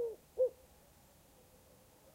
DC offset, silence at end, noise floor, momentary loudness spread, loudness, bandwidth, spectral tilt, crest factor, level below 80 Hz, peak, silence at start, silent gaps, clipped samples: under 0.1%; 1.65 s; -64 dBFS; 26 LU; -38 LUFS; 16 kHz; -5 dB/octave; 18 dB; -72 dBFS; -24 dBFS; 0 s; none; under 0.1%